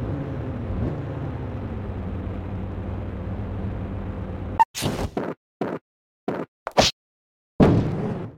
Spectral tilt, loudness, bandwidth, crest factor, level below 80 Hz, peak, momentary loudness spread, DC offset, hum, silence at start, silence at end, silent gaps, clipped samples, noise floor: -5.5 dB/octave; -26 LUFS; 16.5 kHz; 22 dB; -38 dBFS; -4 dBFS; 12 LU; under 0.1%; none; 0 s; 0 s; 4.65-4.74 s, 5.37-5.60 s, 5.81-6.27 s, 6.48-6.66 s, 6.93-7.59 s; under 0.1%; under -90 dBFS